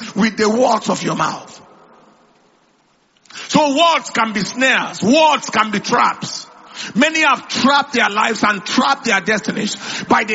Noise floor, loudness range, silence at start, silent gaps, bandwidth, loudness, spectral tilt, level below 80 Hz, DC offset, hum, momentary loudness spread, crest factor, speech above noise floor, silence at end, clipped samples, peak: -57 dBFS; 5 LU; 0 s; none; 8 kHz; -15 LUFS; -3.5 dB/octave; -60 dBFS; under 0.1%; none; 11 LU; 16 dB; 42 dB; 0 s; under 0.1%; 0 dBFS